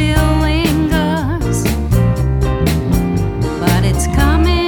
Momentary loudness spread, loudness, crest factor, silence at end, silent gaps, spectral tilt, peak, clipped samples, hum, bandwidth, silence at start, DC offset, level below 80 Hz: 4 LU; -15 LUFS; 12 dB; 0 s; none; -6 dB/octave; 0 dBFS; under 0.1%; none; 19.5 kHz; 0 s; under 0.1%; -18 dBFS